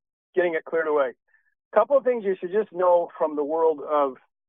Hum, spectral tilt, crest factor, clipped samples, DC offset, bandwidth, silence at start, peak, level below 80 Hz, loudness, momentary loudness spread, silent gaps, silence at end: none; -8.5 dB/octave; 18 dB; under 0.1%; under 0.1%; 3.8 kHz; 0.35 s; -6 dBFS; -84 dBFS; -24 LUFS; 6 LU; 1.65-1.71 s; 0.35 s